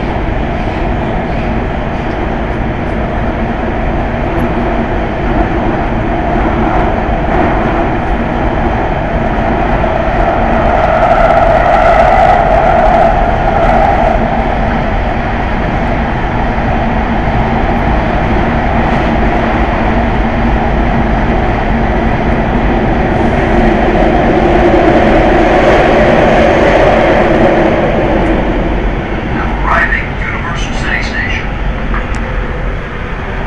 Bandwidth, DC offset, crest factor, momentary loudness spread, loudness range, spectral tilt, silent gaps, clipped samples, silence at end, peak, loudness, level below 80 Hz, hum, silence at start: 8.4 kHz; 2%; 10 dB; 8 LU; 7 LU; -7.5 dB/octave; none; under 0.1%; 0 s; 0 dBFS; -11 LUFS; -16 dBFS; none; 0 s